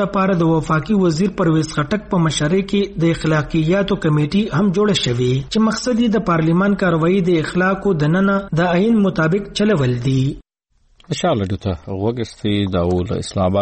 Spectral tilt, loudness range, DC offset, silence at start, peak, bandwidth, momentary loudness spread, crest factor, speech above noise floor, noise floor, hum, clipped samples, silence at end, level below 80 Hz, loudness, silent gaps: -6.5 dB/octave; 4 LU; under 0.1%; 0 s; -6 dBFS; 8.8 kHz; 6 LU; 10 dB; 42 dB; -59 dBFS; none; under 0.1%; 0 s; -40 dBFS; -17 LUFS; none